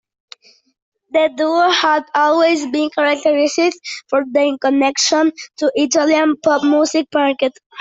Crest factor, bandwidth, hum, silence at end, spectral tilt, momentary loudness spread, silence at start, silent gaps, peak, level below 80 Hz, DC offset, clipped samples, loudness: 14 dB; 8 kHz; none; 0 s; -1.5 dB/octave; 6 LU; 1.15 s; 7.66-7.70 s; -2 dBFS; -64 dBFS; under 0.1%; under 0.1%; -15 LUFS